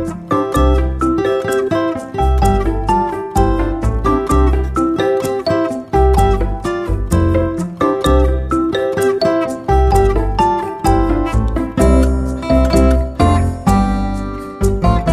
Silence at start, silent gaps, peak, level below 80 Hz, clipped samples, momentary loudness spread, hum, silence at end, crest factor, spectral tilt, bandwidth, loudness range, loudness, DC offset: 0 s; none; 0 dBFS; -18 dBFS; under 0.1%; 6 LU; none; 0 s; 14 dB; -7 dB/octave; 14 kHz; 1 LU; -15 LUFS; under 0.1%